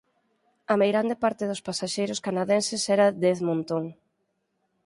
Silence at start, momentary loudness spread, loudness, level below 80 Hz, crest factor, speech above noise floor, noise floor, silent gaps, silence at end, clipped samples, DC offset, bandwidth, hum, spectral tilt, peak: 0.7 s; 9 LU; -25 LUFS; -70 dBFS; 18 dB; 51 dB; -76 dBFS; none; 0.9 s; under 0.1%; under 0.1%; 11.5 kHz; none; -4.5 dB/octave; -8 dBFS